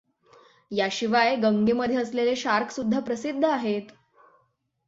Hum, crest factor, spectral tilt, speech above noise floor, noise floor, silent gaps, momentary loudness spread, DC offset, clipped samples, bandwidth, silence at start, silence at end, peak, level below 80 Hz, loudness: none; 18 dB; -5 dB/octave; 46 dB; -70 dBFS; none; 7 LU; under 0.1%; under 0.1%; 7.8 kHz; 0.7 s; 0.95 s; -8 dBFS; -64 dBFS; -25 LUFS